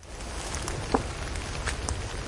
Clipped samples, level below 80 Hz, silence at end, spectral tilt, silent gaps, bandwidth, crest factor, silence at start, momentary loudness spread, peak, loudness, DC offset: under 0.1%; -38 dBFS; 0 s; -4 dB/octave; none; 11.5 kHz; 26 dB; 0 s; 5 LU; -6 dBFS; -32 LUFS; under 0.1%